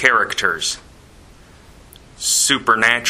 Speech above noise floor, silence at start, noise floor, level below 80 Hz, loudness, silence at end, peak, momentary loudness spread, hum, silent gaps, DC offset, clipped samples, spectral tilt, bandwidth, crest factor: 28 dB; 0 s; -45 dBFS; -50 dBFS; -16 LUFS; 0 s; 0 dBFS; 9 LU; none; none; under 0.1%; under 0.1%; -0.5 dB/octave; 16 kHz; 20 dB